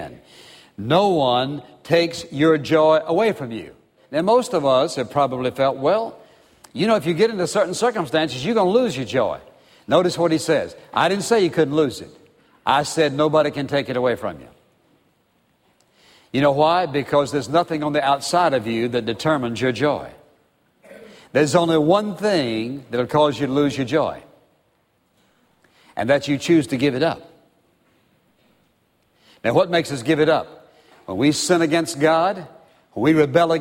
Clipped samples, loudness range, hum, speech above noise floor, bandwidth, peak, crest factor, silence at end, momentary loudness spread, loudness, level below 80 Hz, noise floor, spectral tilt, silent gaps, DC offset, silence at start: under 0.1%; 4 LU; none; 45 dB; 16 kHz; -2 dBFS; 18 dB; 0 s; 10 LU; -19 LUFS; -60 dBFS; -64 dBFS; -5 dB/octave; none; under 0.1%; 0 s